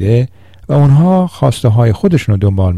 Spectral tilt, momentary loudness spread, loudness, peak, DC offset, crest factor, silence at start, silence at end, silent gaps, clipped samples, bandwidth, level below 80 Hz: -8.5 dB/octave; 6 LU; -11 LUFS; 0 dBFS; under 0.1%; 10 dB; 0 s; 0 s; none; under 0.1%; 12.5 kHz; -36 dBFS